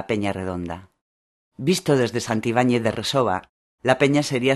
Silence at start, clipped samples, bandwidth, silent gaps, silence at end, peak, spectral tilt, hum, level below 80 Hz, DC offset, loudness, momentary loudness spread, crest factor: 0 s; under 0.1%; 13 kHz; 1.01-1.52 s, 3.49-3.78 s; 0 s; -2 dBFS; -5 dB/octave; none; -56 dBFS; under 0.1%; -22 LUFS; 10 LU; 22 dB